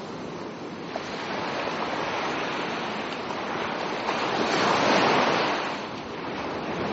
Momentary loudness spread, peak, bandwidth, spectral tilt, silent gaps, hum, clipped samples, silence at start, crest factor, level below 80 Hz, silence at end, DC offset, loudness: 13 LU; -10 dBFS; 8 kHz; -2 dB/octave; none; none; under 0.1%; 0 s; 18 dB; -60 dBFS; 0 s; under 0.1%; -27 LUFS